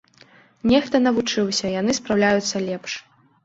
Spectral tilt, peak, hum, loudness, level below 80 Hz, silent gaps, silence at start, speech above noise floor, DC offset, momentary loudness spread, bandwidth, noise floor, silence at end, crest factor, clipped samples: -4 dB/octave; -4 dBFS; none; -21 LUFS; -54 dBFS; none; 0.65 s; 32 dB; under 0.1%; 10 LU; 8 kHz; -52 dBFS; 0.45 s; 18 dB; under 0.1%